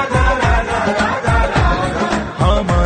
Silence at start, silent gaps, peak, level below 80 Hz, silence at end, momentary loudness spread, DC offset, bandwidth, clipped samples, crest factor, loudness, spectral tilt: 0 s; none; -2 dBFS; -20 dBFS; 0 s; 3 LU; under 0.1%; 9.4 kHz; under 0.1%; 14 dB; -16 LUFS; -6 dB/octave